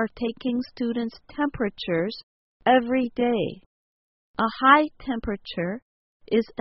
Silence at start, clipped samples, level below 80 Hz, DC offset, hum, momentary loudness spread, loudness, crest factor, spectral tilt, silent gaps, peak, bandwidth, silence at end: 0 s; under 0.1%; -52 dBFS; under 0.1%; none; 13 LU; -25 LUFS; 22 dB; -3.5 dB/octave; 2.23-2.60 s, 3.66-4.34 s, 5.82-6.20 s; -4 dBFS; 5.8 kHz; 0.15 s